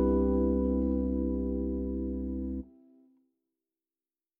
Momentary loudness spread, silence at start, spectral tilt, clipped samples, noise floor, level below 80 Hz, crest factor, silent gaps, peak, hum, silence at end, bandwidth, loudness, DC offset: 10 LU; 0 s; -13 dB/octave; under 0.1%; under -90 dBFS; -38 dBFS; 14 dB; none; -18 dBFS; none; 1.75 s; 1.8 kHz; -31 LUFS; under 0.1%